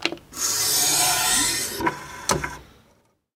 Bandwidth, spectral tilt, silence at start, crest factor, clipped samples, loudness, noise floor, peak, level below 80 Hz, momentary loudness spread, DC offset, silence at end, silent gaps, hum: 17 kHz; -0.5 dB/octave; 0 s; 22 dB; under 0.1%; -21 LUFS; -62 dBFS; -2 dBFS; -48 dBFS; 10 LU; under 0.1%; 0.7 s; none; none